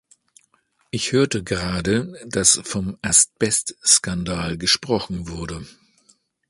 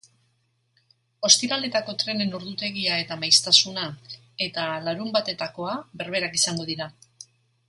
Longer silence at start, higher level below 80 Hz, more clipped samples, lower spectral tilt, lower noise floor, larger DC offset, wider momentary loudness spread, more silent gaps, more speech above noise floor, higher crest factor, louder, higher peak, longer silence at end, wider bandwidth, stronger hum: second, 0.95 s vs 1.2 s; first, -44 dBFS vs -68 dBFS; neither; about the same, -2.5 dB/octave vs -1.5 dB/octave; second, -64 dBFS vs -70 dBFS; neither; about the same, 14 LU vs 15 LU; neither; about the same, 43 dB vs 45 dB; about the same, 22 dB vs 26 dB; first, -19 LUFS vs -23 LUFS; about the same, 0 dBFS vs 0 dBFS; first, 0.8 s vs 0.45 s; about the same, 11.5 kHz vs 11.5 kHz; neither